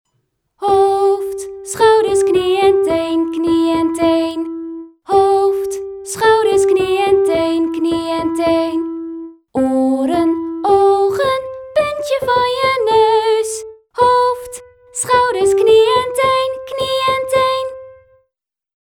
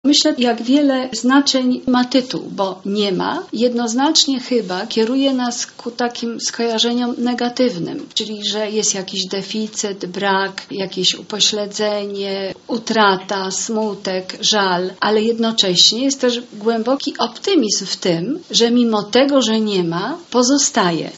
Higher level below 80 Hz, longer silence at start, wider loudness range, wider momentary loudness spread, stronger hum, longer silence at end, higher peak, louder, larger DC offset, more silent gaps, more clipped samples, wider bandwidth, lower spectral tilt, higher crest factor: first, -50 dBFS vs -64 dBFS; first, 0.6 s vs 0.05 s; about the same, 2 LU vs 4 LU; first, 13 LU vs 9 LU; neither; first, 0.85 s vs 0 s; about the same, 0 dBFS vs 0 dBFS; about the same, -15 LUFS vs -17 LUFS; neither; neither; neither; first, 16.5 kHz vs 8.2 kHz; about the same, -4 dB/octave vs -3 dB/octave; about the same, 14 dB vs 18 dB